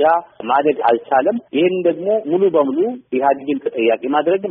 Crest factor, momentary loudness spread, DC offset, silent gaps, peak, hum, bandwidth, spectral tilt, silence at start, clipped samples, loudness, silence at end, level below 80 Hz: 14 dB; 5 LU; under 0.1%; none; -4 dBFS; none; 4 kHz; -4 dB/octave; 0 s; under 0.1%; -17 LUFS; 0 s; -66 dBFS